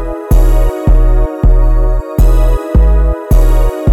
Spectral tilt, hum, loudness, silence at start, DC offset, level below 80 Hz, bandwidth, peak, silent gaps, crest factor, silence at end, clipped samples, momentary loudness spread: -8 dB/octave; none; -12 LUFS; 0 s; under 0.1%; -8 dBFS; 13.5 kHz; 0 dBFS; none; 8 dB; 0 s; under 0.1%; 3 LU